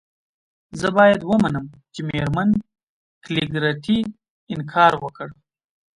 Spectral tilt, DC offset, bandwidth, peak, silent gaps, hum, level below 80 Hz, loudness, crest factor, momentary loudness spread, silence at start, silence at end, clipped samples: -6.5 dB/octave; under 0.1%; 11 kHz; -2 dBFS; 2.83-3.21 s, 4.30-4.47 s; none; -50 dBFS; -20 LUFS; 20 dB; 17 LU; 0.75 s; 0.65 s; under 0.1%